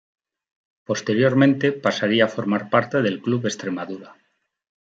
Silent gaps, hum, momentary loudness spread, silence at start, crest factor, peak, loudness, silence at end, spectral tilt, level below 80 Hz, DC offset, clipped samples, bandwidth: none; none; 11 LU; 0.9 s; 18 dB; -4 dBFS; -21 LUFS; 0.7 s; -5.5 dB/octave; -68 dBFS; under 0.1%; under 0.1%; 7.8 kHz